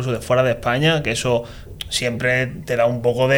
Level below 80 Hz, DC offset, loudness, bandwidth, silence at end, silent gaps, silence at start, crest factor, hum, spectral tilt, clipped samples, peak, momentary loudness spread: -42 dBFS; under 0.1%; -19 LUFS; 20 kHz; 0 s; none; 0 s; 14 dB; none; -4.5 dB/octave; under 0.1%; -6 dBFS; 6 LU